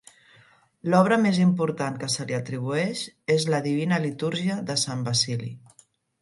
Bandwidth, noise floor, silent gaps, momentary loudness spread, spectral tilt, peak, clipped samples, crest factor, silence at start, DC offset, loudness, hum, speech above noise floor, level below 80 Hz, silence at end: 11.5 kHz; -60 dBFS; none; 9 LU; -5 dB/octave; -4 dBFS; under 0.1%; 20 dB; 0.85 s; under 0.1%; -25 LUFS; none; 36 dB; -68 dBFS; 0.65 s